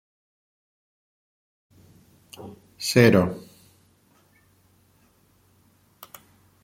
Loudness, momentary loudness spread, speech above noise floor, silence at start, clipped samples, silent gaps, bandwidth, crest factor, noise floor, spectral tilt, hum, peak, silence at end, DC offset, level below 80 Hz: -20 LUFS; 29 LU; 41 dB; 2.4 s; under 0.1%; none; 16.5 kHz; 26 dB; -62 dBFS; -5.5 dB/octave; none; -2 dBFS; 3.25 s; under 0.1%; -62 dBFS